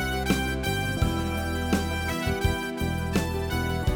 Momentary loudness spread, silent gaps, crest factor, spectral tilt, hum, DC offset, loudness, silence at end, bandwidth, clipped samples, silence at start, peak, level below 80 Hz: 3 LU; none; 16 dB; -5 dB/octave; none; under 0.1%; -27 LUFS; 0 s; over 20 kHz; under 0.1%; 0 s; -10 dBFS; -34 dBFS